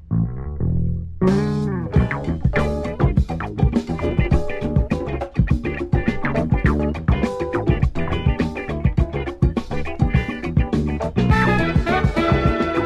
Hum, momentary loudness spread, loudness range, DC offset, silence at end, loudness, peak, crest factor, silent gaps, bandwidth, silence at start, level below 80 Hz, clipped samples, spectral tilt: none; 5 LU; 2 LU; under 0.1%; 0 s; -21 LUFS; -6 dBFS; 14 dB; none; 9.8 kHz; 0 s; -26 dBFS; under 0.1%; -8 dB/octave